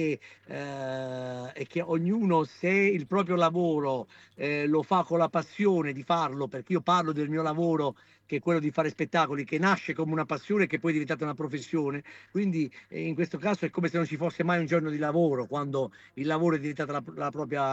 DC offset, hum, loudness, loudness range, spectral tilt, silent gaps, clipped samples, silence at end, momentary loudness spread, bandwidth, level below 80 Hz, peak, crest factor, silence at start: under 0.1%; none; -29 LUFS; 3 LU; -7 dB/octave; none; under 0.1%; 0 s; 10 LU; 8.2 kHz; -74 dBFS; -12 dBFS; 16 dB; 0 s